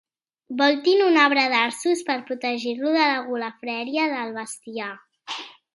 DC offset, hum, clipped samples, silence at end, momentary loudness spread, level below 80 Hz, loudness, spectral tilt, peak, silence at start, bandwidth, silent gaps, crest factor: under 0.1%; none; under 0.1%; 0.25 s; 16 LU; -80 dBFS; -22 LUFS; -2.5 dB/octave; -2 dBFS; 0.5 s; 11.5 kHz; none; 20 dB